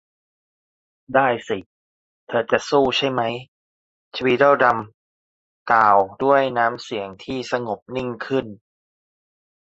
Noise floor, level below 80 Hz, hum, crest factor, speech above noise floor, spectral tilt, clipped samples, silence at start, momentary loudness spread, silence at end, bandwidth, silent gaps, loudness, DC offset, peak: under -90 dBFS; -58 dBFS; none; 20 dB; over 70 dB; -5 dB/octave; under 0.1%; 1.1 s; 14 LU; 1.15 s; 8 kHz; 1.66-2.27 s, 3.48-4.11 s, 4.94-5.66 s, 7.82-7.86 s; -20 LUFS; under 0.1%; -2 dBFS